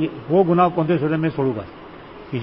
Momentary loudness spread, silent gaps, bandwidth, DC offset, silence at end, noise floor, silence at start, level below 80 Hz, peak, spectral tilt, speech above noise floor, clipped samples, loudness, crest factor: 22 LU; none; 5.6 kHz; under 0.1%; 0 s; -39 dBFS; 0 s; -52 dBFS; -4 dBFS; -12.5 dB/octave; 20 dB; under 0.1%; -19 LUFS; 16 dB